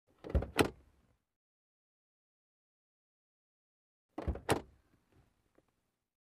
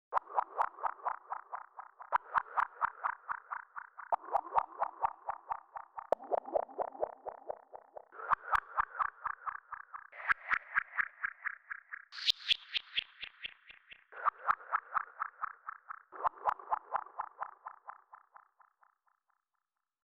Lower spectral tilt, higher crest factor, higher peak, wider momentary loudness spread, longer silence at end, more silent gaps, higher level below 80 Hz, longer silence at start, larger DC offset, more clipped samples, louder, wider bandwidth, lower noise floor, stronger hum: first, -5 dB/octave vs -1.5 dB/octave; about the same, 28 dB vs 26 dB; about the same, -14 dBFS vs -14 dBFS; second, 10 LU vs 16 LU; second, 1.55 s vs 2.1 s; first, 1.36-4.09 s vs none; first, -48 dBFS vs -70 dBFS; first, 0.25 s vs 0.1 s; neither; neither; about the same, -37 LUFS vs -37 LUFS; first, 13 kHz vs 8.2 kHz; second, -82 dBFS vs -89 dBFS; neither